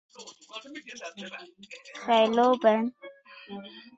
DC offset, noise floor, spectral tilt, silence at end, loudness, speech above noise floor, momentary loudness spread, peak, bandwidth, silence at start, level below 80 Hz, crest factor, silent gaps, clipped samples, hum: under 0.1%; -45 dBFS; -4.5 dB/octave; 0.15 s; -24 LUFS; 18 dB; 25 LU; -8 dBFS; 8 kHz; 0.2 s; -76 dBFS; 22 dB; none; under 0.1%; none